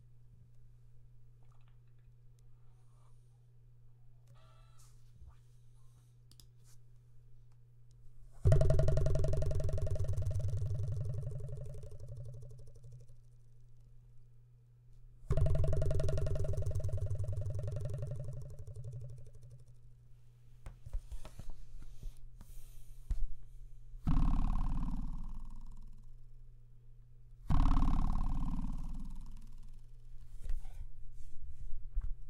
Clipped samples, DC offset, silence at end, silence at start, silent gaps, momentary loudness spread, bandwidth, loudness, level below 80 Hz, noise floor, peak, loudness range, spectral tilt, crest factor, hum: under 0.1%; under 0.1%; 0 s; 0.15 s; none; 26 LU; 9.6 kHz; -39 LUFS; -40 dBFS; -60 dBFS; -12 dBFS; 17 LU; -8 dB/octave; 24 dB; none